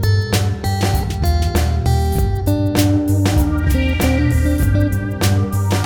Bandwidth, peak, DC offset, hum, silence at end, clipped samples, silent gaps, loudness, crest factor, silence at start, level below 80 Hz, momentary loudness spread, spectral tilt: over 20 kHz; -2 dBFS; 0.1%; none; 0 s; under 0.1%; none; -17 LUFS; 14 dB; 0 s; -22 dBFS; 3 LU; -6 dB/octave